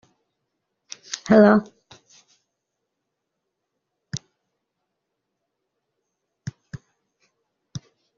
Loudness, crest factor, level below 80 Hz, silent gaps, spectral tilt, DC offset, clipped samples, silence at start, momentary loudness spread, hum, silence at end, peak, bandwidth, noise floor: -18 LUFS; 24 dB; -62 dBFS; none; -5.5 dB/octave; under 0.1%; under 0.1%; 1.1 s; 28 LU; none; 0.4 s; -2 dBFS; 7.4 kHz; -80 dBFS